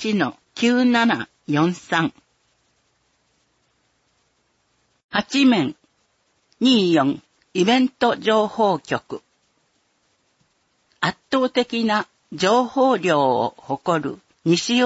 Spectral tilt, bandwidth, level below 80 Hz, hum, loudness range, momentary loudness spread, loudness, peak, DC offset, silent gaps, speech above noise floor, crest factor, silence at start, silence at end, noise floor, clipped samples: -5 dB/octave; 8 kHz; -66 dBFS; none; 7 LU; 10 LU; -20 LUFS; -4 dBFS; under 0.1%; 5.04-5.09 s; 48 dB; 16 dB; 0 s; 0 s; -67 dBFS; under 0.1%